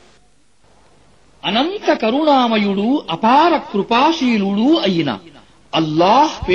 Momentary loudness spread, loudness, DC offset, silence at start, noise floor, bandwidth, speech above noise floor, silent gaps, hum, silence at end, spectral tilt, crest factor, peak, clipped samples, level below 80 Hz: 7 LU; -15 LUFS; 0.3%; 1.45 s; -56 dBFS; 7.8 kHz; 41 dB; none; none; 0 s; -5.5 dB/octave; 14 dB; -2 dBFS; under 0.1%; -46 dBFS